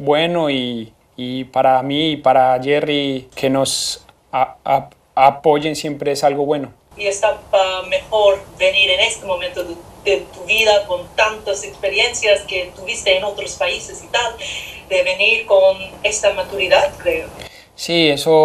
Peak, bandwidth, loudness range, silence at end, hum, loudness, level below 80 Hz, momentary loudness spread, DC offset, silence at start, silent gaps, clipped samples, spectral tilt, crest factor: 0 dBFS; 15.5 kHz; 2 LU; 0 s; none; -17 LUFS; -48 dBFS; 12 LU; under 0.1%; 0 s; none; under 0.1%; -3 dB/octave; 18 dB